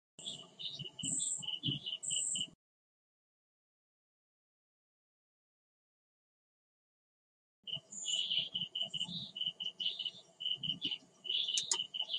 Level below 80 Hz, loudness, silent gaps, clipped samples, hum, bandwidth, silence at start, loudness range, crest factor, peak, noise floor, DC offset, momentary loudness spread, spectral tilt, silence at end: -80 dBFS; -37 LUFS; 2.55-7.63 s; under 0.1%; none; 11.5 kHz; 0.2 s; 8 LU; 28 dB; -14 dBFS; under -90 dBFS; under 0.1%; 10 LU; -0.5 dB/octave; 0 s